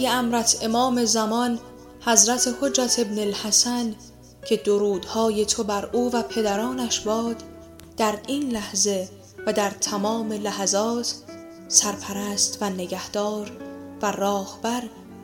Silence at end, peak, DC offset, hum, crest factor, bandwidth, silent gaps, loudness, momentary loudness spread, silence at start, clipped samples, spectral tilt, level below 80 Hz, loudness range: 0 s; 0 dBFS; under 0.1%; none; 24 dB; 17 kHz; none; -23 LUFS; 13 LU; 0 s; under 0.1%; -2.5 dB/octave; -56 dBFS; 5 LU